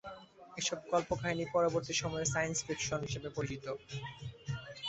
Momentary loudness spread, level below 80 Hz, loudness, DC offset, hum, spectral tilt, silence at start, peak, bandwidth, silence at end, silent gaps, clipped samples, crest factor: 13 LU; -60 dBFS; -36 LUFS; under 0.1%; none; -3.5 dB/octave; 0.05 s; -18 dBFS; 8.2 kHz; 0 s; none; under 0.1%; 18 dB